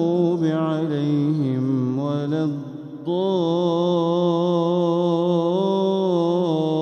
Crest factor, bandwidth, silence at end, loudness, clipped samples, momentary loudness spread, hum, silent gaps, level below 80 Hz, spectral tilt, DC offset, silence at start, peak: 10 dB; 6.8 kHz; 0 s; -21 LUFS; under 0.1%; 4 LU; none; none; -68 dBFS; -8.5 dB/octave; under 0.1%; 0 s; -10 dBFS